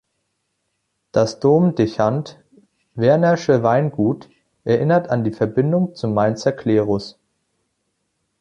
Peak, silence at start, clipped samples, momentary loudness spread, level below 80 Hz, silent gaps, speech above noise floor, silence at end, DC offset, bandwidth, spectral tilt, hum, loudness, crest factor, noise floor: -2 dBFS; 1.15 s; under 0.1%; 10 LU; -56 dBFS; none; 55 dB; 1.3 s; under 0.1%; 9.2 kHz; -7.5 dB/octave; none; -18 LUFS; 18 dB; -73 dBFS